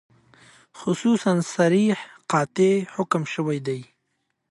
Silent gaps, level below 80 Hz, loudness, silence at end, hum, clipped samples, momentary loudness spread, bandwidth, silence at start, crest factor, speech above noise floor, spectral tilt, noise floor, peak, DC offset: none; -70 dBFS; -23 LUFS; 0.65 s; none; under 0.1%; 9 LU; 11.5 kHz; 0.75 s; 18 dB; 53 dB; -6 dB/octave; -75 dBFS; -6 dBFS; under 0.1%